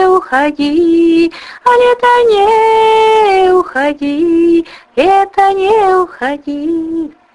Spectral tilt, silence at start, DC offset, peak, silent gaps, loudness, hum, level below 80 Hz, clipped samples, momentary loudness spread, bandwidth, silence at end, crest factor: -4.5 dB/octave; 0 s; under 0.1%; 0 dBFS; none; -10 LUFS; none; -46 dBFS; under 0.1%; 8 LU; 11.5 kHz; 0.25 s; 10 dB